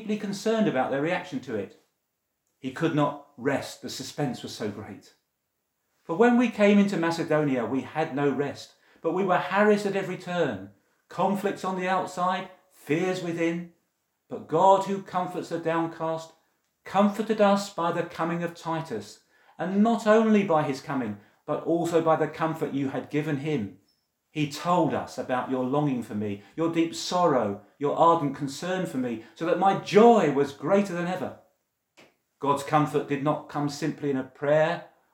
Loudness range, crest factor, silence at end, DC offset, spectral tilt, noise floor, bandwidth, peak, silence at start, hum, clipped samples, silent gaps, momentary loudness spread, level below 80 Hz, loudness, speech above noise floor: 5 LU; 22 dB; 0.25 s; under 0.1%; -6 dB/octave; -79 dBFS; 16.5 kHz; -4 dBFS; 0 s; none; under 0.1%; none; 13 LU; -76 dBFS; -26 LUFS; 54 dB